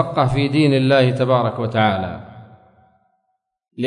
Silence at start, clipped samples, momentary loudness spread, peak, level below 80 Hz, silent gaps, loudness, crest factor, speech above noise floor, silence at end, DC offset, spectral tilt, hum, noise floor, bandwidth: 0 s; under 0.1%; 10 LU; -4 dBFS; -48 dBFS; none; -17 LUFS; 16 dB; 56 dB; 0 s; under 0.1%; -7.5 dB/octave; none; -72 dBFS; 10.5 kHz